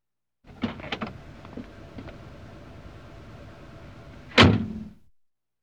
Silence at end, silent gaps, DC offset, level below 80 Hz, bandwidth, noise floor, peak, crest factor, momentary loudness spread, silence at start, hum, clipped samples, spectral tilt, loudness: 0.75 s; none; 0.2%; -46 dBFS; 11 kHz; -67 dBFS; -4 dBFS; 24 dB; 28 LU; 0.6 s; none; under 0.1%; -5.5 dB/octave; -23 LUFS